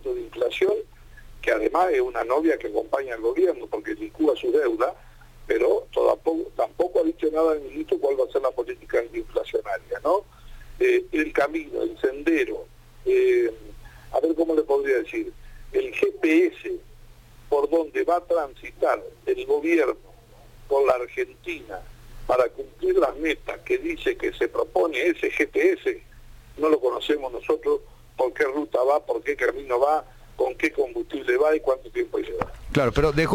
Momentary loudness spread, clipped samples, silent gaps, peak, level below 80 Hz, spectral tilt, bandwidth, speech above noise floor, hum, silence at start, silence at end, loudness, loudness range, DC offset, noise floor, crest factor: 9 LU; under 0.1%; none; -6 dBFS; -46 dBFS; -6 dB/octave; 16.5 kHz; 25 dB; none; 0 s; 0 s; -24 LUFS; 2 LU; under 0.1%; -49 dBFS; 18 dB